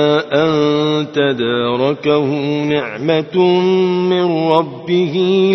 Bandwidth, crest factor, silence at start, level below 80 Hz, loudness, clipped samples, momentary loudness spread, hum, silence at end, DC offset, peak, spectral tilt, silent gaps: 6.2 kHz; 14 dB; 0 s; -58 dBFS; -15 LUFS; under 0.1%; 4 LU; none; 0 s; under 0.1%; 0 dBFS; -7 dB/octave; none